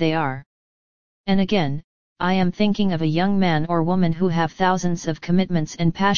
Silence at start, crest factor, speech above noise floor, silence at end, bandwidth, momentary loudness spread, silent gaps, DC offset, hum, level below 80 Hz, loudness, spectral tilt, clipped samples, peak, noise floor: 0 s; 16 dB; over 70 dB; 0 s; 7.2 kHz; 7 LU; 0.46-1.24 s, 1.84-2.16 s; 3%; none; -46 dBFS; -21 LUFS; -6.5 dB/octave; under 0.1%; -4 dBFS; under -90 dBFS